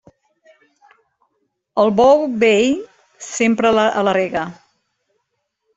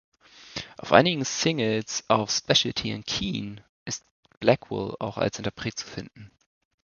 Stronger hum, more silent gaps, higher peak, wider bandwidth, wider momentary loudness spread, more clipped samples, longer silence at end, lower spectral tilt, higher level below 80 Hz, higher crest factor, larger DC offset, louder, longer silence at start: neither; second, none vs 3.69-3.86 s, 4.11-4.23 s, 4.37-4.41 s; about the same, -2 dBFS vs 0 dBFS; first, 8.2 kHz vs 7.4 kHz; second, 13 LU vs 17 LU; neither; first, 1.25 s vs 0.55 s; about the same, -4.5 dB/octave vs -3.5 dB/octave; about the same, -56 dBFS vs -56 dBFS; second, 16 dB vs 26 dB; neither; first, -16 LUFS vs -25 LUFS; first, 1.75 s vs 0.4 s